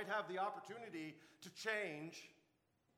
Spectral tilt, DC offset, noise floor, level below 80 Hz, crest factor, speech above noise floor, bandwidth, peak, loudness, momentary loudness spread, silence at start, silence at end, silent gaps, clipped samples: -4 dB/octave; under 0.1%; -81 dBFS; under -90 dBFS; 20 dB; 34 dB; 19 kHz; -28 dBFS; -46 LUFS; 15 LU; 0 s; 0.65 s; none; under 0.1%